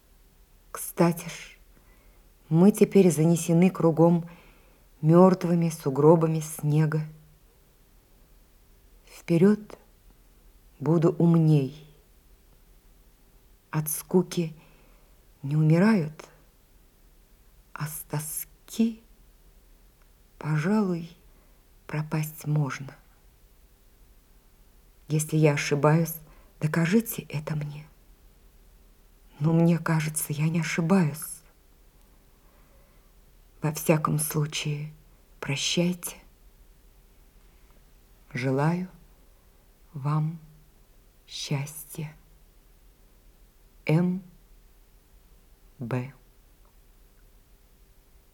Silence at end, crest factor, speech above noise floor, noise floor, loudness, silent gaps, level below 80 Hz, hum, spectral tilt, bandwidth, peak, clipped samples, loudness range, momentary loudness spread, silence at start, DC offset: 2.2 s; 24 dB; 34 dB; -58 dBFS; -25 LUFS; none; -58 dBFS; none; -6.5 dB/octave; 17 kHz; -4 dBFS; under 0.1%; 11 LU; 19 LU; 0.75 s; under 0.1%